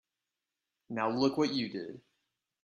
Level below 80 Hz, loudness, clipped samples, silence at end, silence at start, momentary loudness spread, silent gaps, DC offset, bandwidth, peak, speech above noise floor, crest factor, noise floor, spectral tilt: -76 dBFS; -33 LUFS; under 0.1%; 0.65 s; 0.9 s; 13 LU; none; under 0.1%; 10.5 kHz; -16 dBFS; 57 dB; 20 dB; -89 dBFS; -5.5 dB/octave